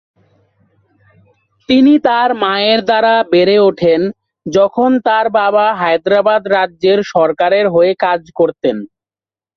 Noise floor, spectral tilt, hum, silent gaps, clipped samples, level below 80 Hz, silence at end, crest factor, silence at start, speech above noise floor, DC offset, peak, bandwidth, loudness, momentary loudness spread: under -90 dBFS; -6 dB/octave; none; none; under 0.1%; -56 dBFS; 0.7 s; 12 dB; 1.7 s; over 78 dB; under 0.1%; 0 dBFS; 6.8 kHz; -12 LUFS; 6 LU